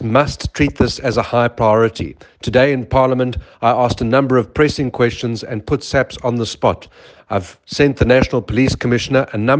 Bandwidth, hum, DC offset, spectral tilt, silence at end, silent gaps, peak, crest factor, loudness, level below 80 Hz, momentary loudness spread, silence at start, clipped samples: 9.6 kHz; none; under 0.1%; -6 dB/octave; 0 s; none; 0 dBFS; 16 dB; -16 LUFS; -36 dBFS; 9 LU; 0 s; under 0.1%